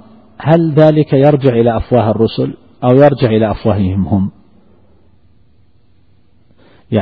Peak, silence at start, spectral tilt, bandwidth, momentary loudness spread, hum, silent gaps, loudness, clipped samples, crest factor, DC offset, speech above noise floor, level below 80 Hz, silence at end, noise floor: 0 dBFS; 0.4 s; -10.5 dB/octave; 5 kHz; 10 LU; none; none; -12 LUFS; under 0.1%; 14 dB; 0.4%; 42 dB; -38 dBFS; 0 s; -52 dBFS